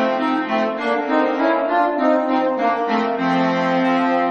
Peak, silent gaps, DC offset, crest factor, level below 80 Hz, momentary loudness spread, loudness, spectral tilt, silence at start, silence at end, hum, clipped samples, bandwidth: -4 dBFS; none; under 0.1%; 14 dB; -66 dBFS; 3 LU; -18 LUFS; -6.5 dB/octave; 0 s; 0 s; none; under 0.1%; 7.4 kHz